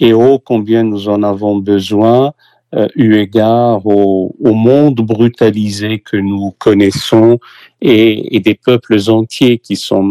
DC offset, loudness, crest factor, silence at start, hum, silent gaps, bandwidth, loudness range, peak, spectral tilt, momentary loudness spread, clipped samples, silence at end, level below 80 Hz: under 0.1%; -11 LUFS; 10 dB; 0 s; none; none; 13.5 kHz; 1 LU; 0 dBFS; -7 dB/octave; 7 LU; 0.8%; 0 s; -52 dBFS